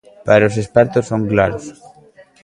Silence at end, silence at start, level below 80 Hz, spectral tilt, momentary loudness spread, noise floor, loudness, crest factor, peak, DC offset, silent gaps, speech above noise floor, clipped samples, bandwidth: 0.7 s; 0.25 s; -44 dBFS; -7 dB/octave; 10 LU; -46 dBFS; -15 LUFS; 16 dB; 0 dBFS; under 0.1%; none; 32 dB; under 0.1%; 11 kHz